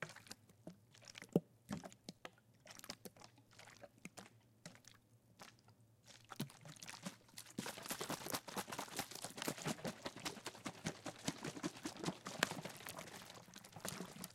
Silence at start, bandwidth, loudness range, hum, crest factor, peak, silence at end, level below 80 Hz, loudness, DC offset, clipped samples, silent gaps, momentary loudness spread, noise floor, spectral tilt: 0 s; 16.5 kHz; 12 LU; none; 38 dB; -12 dBFS; 0 s; -78 dBFS; -48 LUFS; under 0.1%; under 0.1%; none; 19 LU; -69 dBFS; -3.5 dB/octave